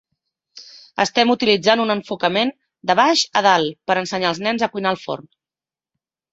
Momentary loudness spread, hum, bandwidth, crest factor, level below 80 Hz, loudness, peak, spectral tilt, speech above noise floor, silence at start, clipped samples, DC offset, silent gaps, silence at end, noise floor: 10 LU; none; 8 kHz; 20 dB; -64 dBFS; -18 LUFS; 0 dBFS; -3.5 dB/octave; over 72 dB; 0.55 s; under 0.1%; under 0.1%; none; 1.1 s; under -90 dBFS